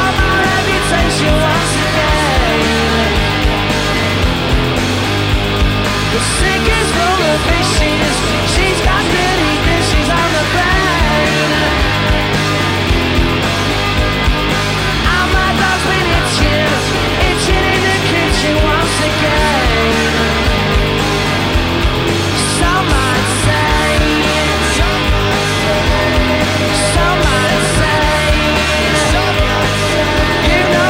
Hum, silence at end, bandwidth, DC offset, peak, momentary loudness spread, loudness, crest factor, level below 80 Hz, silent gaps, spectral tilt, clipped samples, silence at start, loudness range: none; 0 s; 16.5 kHz; under 0.1%; -2 dBFS; 2 LU; -12 LUFS; 10 dB; -20 dBFS; none; -4 dB/octave; under 0.1%; 0 s; 1 LU